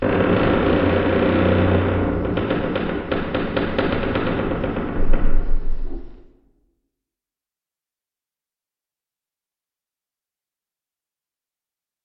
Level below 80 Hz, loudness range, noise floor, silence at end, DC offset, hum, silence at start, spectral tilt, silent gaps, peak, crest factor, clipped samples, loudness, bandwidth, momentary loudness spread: -26 dBFS; 13 LU; under -90 dBFS; 5.9 s; under 0.1%; none; 0 s; -10.5 dB/octave; none; -2 dBFS; 18 dB; under 0.1%; -21 LUFS; 4.8 kHz; 10 LU